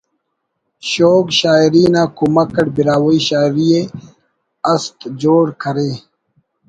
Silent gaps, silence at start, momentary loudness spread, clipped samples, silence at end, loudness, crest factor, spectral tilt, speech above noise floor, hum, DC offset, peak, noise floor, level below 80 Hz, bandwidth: none; 0.85 s; 11 LU; under 0.1%; 0.7 s; -14 LUFS; 14 dB; -5.5 dB/octave; 58 dB; none; under 0.1%; 0 dBFS; -72 dBFS; -52 dBFS; 9.2 kHz